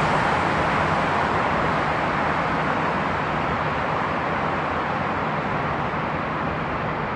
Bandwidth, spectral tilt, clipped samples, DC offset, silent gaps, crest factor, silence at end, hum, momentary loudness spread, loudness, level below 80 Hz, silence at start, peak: 10.5 kHz; -6 dB/octave; under 0.1%; under 0.1%; none; 14 dB; 0 s; none; 4 LU; -23 LUFS; -44 dBFS; 0 s; -8 dBFS